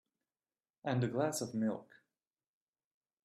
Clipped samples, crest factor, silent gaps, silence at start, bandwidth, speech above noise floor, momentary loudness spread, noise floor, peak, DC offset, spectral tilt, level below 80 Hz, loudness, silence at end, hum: under 0.1%; 20 dB; none; 0.85 s; 13.5 kHz; over 54 dB; 9 LU; under -90 dBFS; -20 dBFS; under 0.1%; -5.5 dB/octave; -76 dBFS; -37 LUFS; 1.4 s; none